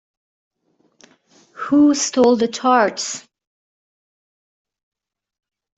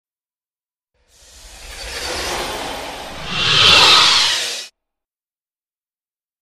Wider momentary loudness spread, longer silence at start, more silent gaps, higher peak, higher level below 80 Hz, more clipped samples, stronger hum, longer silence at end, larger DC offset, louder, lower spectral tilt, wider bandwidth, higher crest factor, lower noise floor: second, 13 LU vs 22 LU; about the same, 1.55 s vs 1.45 s; neither; about the same, -2 dBFS vs 0 dBFS; second, -66 dBFS vs -42 dBFS; neither; neither; first, 2.6 s vs 1.8 s; neither; second, -16 LUFS vs -12 LUFS; first, -3 dB/octave vs -0.5 dB/octave; second, 8.2 kHz vs 14.5 kHz; about the same, 18 dB vs 20 dB; second, -59 dBFS vs under -90 dBFS